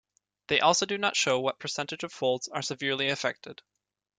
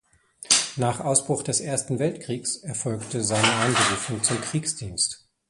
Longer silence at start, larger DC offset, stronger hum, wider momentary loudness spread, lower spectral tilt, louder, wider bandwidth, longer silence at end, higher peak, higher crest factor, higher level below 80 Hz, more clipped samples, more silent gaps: about the same, 0.5 s vs 0.4 s; neither; neither; about the same, 10 LU vs 8 LU; about the same, -2.5 dB/octave vs -3 dB/octave; second, -28 LUFS vs -24 LUFS; second, 10 kHz vs 11.5 kHz; first, 0.65 s vs 0.35 s; second, -8 dBFS vs -2 dBFS; about the same, 22 dB vs 22 dB; second, -70 dBFS vs -56 dBFS; neither; neither